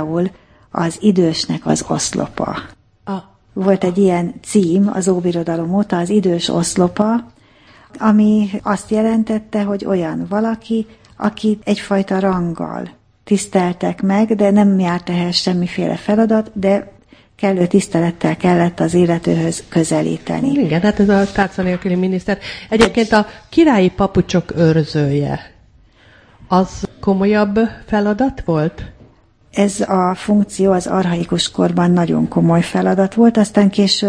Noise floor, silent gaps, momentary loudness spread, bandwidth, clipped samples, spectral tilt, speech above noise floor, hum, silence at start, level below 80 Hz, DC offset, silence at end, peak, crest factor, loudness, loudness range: -49 dBFS; none; 9 LU; 10.5 kHz; under 0.1%; -6 dB/octave; 34 dB; none; 0 s; -44 dBFS; under 0.1%; 0 s; 0 dBFS; 16 dB; -16 LUFS; 4 LU